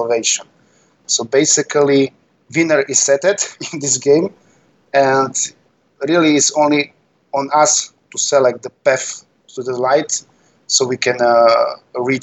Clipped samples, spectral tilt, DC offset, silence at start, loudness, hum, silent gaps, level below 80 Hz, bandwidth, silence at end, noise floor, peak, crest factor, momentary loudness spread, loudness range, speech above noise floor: under 0.1%; -2.5 dB/octave; under 0.1%; 0 s; -15 LUFS; none; none; -70 dBFS; 8.6 kHz; 0 s; -54 dBFS; 0 dBFS; 16 dB; 10 LU; 2 LU; 40 dB